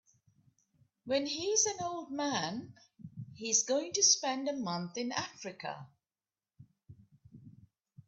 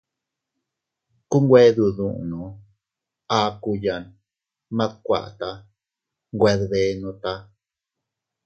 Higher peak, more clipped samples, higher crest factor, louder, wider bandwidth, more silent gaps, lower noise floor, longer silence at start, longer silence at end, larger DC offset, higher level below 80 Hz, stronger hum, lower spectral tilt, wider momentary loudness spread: second, -14 dBFS vs -2 dBFS; neither; about the same, 24 dB vs 22 dB; second, -32 LUFS vs -21 LUFS; about the same, 8.4 kHz vs 8 kHz; neither; first, under -90 dBFS vs -86 dBFS; second, 1.05 s vs 1.3 s; second, 0.55 s vs 1.05 s; neither; second, -78 dBFS vs -52 dBFS; neither; second, -2 dB/octave vs -6.5 dB/octave; first, 22 LU vs 18 LU